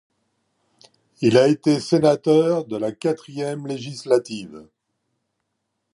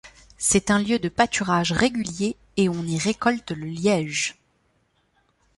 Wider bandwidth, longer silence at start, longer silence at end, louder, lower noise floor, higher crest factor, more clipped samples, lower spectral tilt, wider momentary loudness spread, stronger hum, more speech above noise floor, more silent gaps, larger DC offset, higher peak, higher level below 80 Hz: about the same, 11.5 kHz vs 11.5 kHz; first, 1.2 s vs 0.05 s; about the same, 1.3 s vs 1.25 s; first, -20 LUFS vs -23 LUFS; first, -76 dBFS vs -67 dBFS; about the same, 18 dB vs 20 dB; neither; first, -6 dB/octave vs -4 dB/octave; first, 14 LU vs 7 LU; neither; first, 57 dB vs 44 dB; neither; neither; about the same, -4 dBFS vs -4 dBFS; second, -66 dBFS vs -50 dBFS